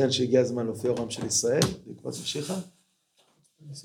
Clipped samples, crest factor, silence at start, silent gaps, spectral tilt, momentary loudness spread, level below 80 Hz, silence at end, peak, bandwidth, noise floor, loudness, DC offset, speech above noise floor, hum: under 0.1%; 22 dB; 0 s; none; -4 dB/octave; 15 LU; -60 dBFS; 0 s; -6 dBFS; 18 kHz; -68 dBFS; -27 LUFS; under 0.1%; 41 dB; none